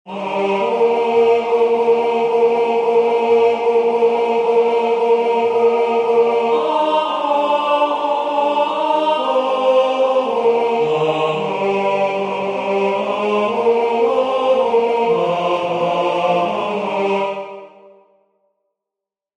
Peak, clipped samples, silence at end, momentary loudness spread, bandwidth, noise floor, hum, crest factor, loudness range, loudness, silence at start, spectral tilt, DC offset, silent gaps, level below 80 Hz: -4 dBFS; under 0.1%; 1.7 s; 4 LU; 9 kHz; -85 dBFS; none; 12 dB; 3 LU; -16 LUFS; 0.05 s; -5.5 dB/octave; under 0.1%; none; -68 dBFS